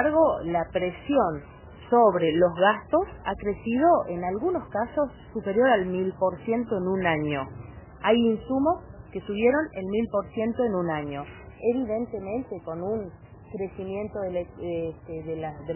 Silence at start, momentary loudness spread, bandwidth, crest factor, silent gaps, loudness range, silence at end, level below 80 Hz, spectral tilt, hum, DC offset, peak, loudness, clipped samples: 0 s; 13 LU; 3.2 kHz; 18 dB; none; 8 LU; 0 s; -50 dBFS; -10.5 dB/octave; none; under 0.1%; -8 dBFS; -26 LUFS; under 0.1%